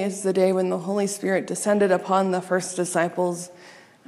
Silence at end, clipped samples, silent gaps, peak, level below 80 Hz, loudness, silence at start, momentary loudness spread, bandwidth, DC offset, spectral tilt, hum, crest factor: 0.35 s; under 0.1%; none; -6 dBFS; -76 dBFS; -23 LUFS; 0 s; 6 LU; 14 kHz; under 0.1%; -5 dB/octave; none; 16 dB